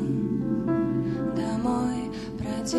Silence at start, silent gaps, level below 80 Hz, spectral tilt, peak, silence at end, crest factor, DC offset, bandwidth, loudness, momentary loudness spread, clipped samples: 0 s; none; -48 dBFS; -6.5 dB/octave; -14 dBFS; 0 s; 14 dB; under 0.1%; 12.5 kHz; -28 LUFS; 6 LU; under 0.1%